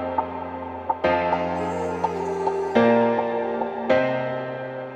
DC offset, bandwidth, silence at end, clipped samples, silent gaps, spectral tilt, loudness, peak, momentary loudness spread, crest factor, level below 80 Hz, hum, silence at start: under 0.1%; 9 kHz; 0 s; under 0.1%; none; -6.5 dB/octave; -24 LUFS; -6 dBFS; 12 LU; 18 dB; -54 dBFS; none; 0 s